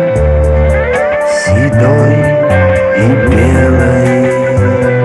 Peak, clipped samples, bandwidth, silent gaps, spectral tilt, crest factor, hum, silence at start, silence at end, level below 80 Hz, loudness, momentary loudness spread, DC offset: 0 dBFS; under 0.1%; 12 kHz; none; -7.5 dB/octave; 8 dB; none; 0 s; 0 s; -18 dBFS; -9 LUFS; 3 LU; under 0.1%